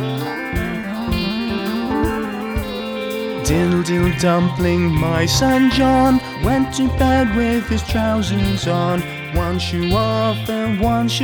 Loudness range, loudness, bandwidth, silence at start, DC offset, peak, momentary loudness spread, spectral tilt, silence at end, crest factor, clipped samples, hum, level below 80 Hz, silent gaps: 5 LU; -18 LUFS; over 20 kHz; 0 s; under 0.1%; -4 dBFS; 9 LU; -5.5 dB/octave; 0 s; 14 dB; under 0.1%; none; -30 dBFS; none